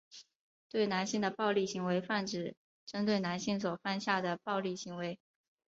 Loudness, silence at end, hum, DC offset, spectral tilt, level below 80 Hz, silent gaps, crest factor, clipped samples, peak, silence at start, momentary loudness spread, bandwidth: -35 LUFS; 0.55 s; none; under 0.1%; -4 dB/octave; -76 dBFS; 0.35-0.70 s, 2.57-2.87 s; 20 dB; under 0.1%; -16 dBFS; 0.1 s; 11 LU; 7.8 kHz